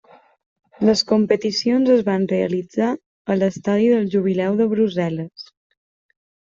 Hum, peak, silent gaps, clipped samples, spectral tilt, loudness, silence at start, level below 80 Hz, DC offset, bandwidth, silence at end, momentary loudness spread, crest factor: none; -4 dBFS; 3.06-3.25 s; under 0.1%; -6 dB/octave; -19 LUFS; 0.8 s; -60 dBFS; under 0.1%; 7.6 kHz; 1.05 s; 8 LU; 16 dB